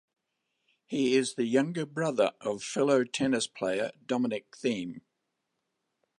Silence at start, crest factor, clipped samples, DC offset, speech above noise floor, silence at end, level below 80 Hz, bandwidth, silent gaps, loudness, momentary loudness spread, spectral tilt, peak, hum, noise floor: 0.9 s; 20 dB; under 0.1%; under 0.1%; 53 dB; 1.2 s; -74 dBFS; 11.5 kHz; none; -30 LUFS; 8 LU; -4.5 dB/octave; -12 dBFS; none; -82 dBFS